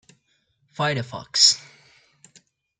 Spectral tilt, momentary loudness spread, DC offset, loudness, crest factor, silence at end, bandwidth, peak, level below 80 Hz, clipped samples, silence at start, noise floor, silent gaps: -1.5 dB/octave; 13 LU; under 0.1%; -19 LUFS; 24 dB; 1.2 s; 11.5 kHz; -2 dBFS; -68 dBFS; under 0.1%; 0.8 s; -68 dBFS; none